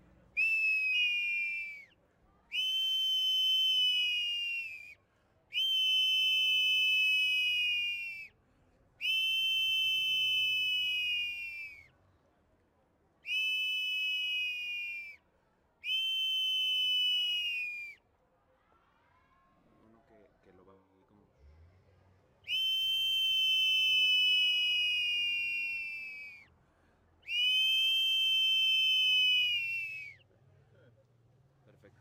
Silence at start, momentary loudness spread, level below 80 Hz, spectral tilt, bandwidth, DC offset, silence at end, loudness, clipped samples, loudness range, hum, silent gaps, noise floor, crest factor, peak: 0.35 s; 14 LU; -74 dBFS; 2.5 dB/octave; 16.5 kHz; under 0.1%; 1.9 s; -28 LUFS; under 0.1%; 7 LU; none; none; -72 dBFS; 12 dB; -20 dBFS